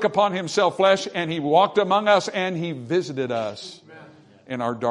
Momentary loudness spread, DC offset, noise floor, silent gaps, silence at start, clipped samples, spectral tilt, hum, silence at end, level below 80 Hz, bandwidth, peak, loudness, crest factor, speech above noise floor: 11 LU; under 0.1%; -48 dBFS; none; 0 s; under 0.1%; -5 dB/octave; none; 0 s; -70 dBFS; 11 kHz; -4 dBFS; -22 LUFS; 18 dB; 26 dB